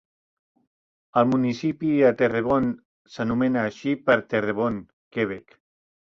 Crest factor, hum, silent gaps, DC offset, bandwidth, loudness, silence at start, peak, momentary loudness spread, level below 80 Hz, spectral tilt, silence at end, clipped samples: 20 dB; none; 2.85-3.05 s, 4.93-5.11 s; under 0.1%; 7 kHz; -23 LUFS; 1.15 s; -6 dBFS; 12 LU; -58 dBFS; -7.5 dB/octave; 0.65 s; under 0.1%